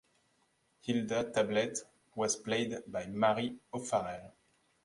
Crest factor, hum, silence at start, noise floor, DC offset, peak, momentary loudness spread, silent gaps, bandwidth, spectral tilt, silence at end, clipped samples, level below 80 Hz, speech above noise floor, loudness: 20 dB; none; 0.85 s; -74 dBFS; under 0.1%; -16 dBFS; 12 LU; none; 11.5 kHz; -4 dB/octave; 0.55 s; under 0.1%; -70 dBFS; 40 dB; -34 LUFS